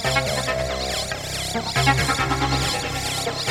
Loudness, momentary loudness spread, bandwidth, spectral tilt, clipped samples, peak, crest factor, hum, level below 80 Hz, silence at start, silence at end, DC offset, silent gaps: -22 LUFS; 6 LU; 16.5 kHz; -3.5 dB/octave; under 0.1%; -4 dBFS; 18 dB; none; -36 dBFS; 0 s; 0 s; under 0.1%; none